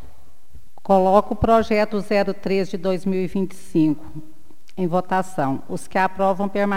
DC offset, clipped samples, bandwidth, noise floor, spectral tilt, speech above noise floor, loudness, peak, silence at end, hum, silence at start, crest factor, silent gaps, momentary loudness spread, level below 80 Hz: 4%; under 0.1%; 16 kHz; -51 dBFS; -7 dB/octave; 31 dB; -21 LUFS; -2 dBFS; 0 s; none; 0.05 s; 20 dB; none; 11 LU; -44 dBFS